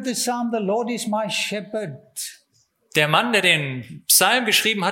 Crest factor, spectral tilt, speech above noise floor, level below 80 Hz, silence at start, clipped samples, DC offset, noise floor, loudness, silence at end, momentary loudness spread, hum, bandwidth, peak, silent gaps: 20 dB; -2 dB/octave; 43 dB; -70 dBFS; 0 s; under 0.1%; under 0.1%; -64 dBFS; -19 LUFS; 0 s; 16 LU; none; 17 kHz; -2 dBFS; none